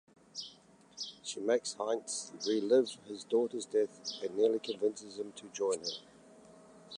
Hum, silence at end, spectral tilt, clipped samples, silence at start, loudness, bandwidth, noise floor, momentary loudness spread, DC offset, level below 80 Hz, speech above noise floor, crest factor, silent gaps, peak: none; 0 s; -3 dB/octave; under 0.1%; 0.35 s; -35 LUFS; 11 kHz; -60 dBFS; 15 LU; under 0.1%; -84 dBFS; 27 dB; 18 dB; none; -16 dBFS